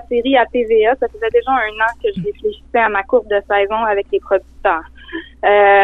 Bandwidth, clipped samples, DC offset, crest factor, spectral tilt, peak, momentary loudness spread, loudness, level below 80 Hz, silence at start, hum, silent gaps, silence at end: 4.1 kHz; under 0.1%; under 0.1%; 14 dB; -6.5 dB/octave; -2 dBFS; 8 LU; -16 LUFS; -42 dBFS; 0.1 s; none; none; 0 s